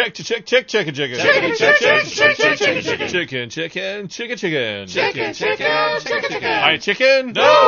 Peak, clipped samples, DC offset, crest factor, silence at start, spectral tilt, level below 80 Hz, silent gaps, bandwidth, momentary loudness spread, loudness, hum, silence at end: 0 dBFS; under 0.1%; under 0.1%; 18 dB; 0 s; -3 dB/octave; -60 dBFS; none; 7.4 kHz; 11 LU; -17 LUFS; none; 0 s